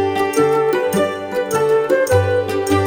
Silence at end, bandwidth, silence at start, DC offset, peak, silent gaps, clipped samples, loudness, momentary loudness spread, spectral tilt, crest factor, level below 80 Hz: 0 s; 17 kHz; 0 s; under 0.1%; -2 dBFS; none; under 0.1%; -17 LUFS; 5 LU; -5.5 dB/octave; 14 dB; -52 dBFS